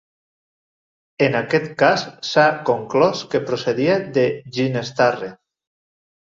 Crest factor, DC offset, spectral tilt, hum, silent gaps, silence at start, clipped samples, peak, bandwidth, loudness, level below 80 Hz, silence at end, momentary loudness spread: 18 dB; under 0.1%; -5.5 dB/octave; none; none; 1.2 s; under 0.1%; -2 dBFS; 7.6 kHz; -19 LUFS; -62 dBFS; 0.95 s; 6 LU